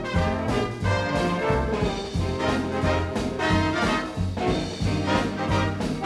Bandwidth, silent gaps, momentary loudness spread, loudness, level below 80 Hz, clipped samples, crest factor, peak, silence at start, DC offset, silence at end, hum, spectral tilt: 12.5 kHz; none; 4 LU; -25 LUFS; -36 dBFS; under 0.1%; 16 dB; -8 dBFS; 0 s; under 0.1%; 0 s; none; -6 dB/octave